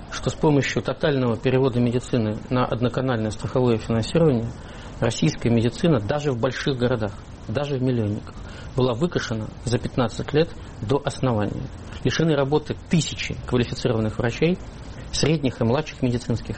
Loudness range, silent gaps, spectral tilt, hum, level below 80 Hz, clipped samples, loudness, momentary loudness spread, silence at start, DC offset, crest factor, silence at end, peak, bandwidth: 3 LU; none; -6 dB/octave; none; -42 dBFS; under 0.1%; -23 LUFS; 9 LU; 0 s; under 0.1%; 16 dB; 0 s; -8 dBFS; 8.8 kHz